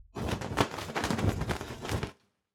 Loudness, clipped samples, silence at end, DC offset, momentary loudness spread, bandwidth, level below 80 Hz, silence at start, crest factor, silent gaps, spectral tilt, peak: -33 LUFS; under 0.1%; 0.45 s; under 0.1%; 6 LU; 18.5 kHz; -44 dBFS; 0 s; 24 dB; none; -5 dB/octave; -10 dBFS